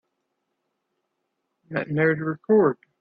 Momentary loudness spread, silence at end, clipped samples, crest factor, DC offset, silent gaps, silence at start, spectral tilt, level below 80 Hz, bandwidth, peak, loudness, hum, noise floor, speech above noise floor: 11 LU; 0.25 s; under 0.1%; 18 dB; under 0.1%; none; 1.7 s; -11.5 dB/octave; -68 dBFS; 4.9 kHz; -8 dBFS; -23 LUFS; none; -78 dBFS; 56 dB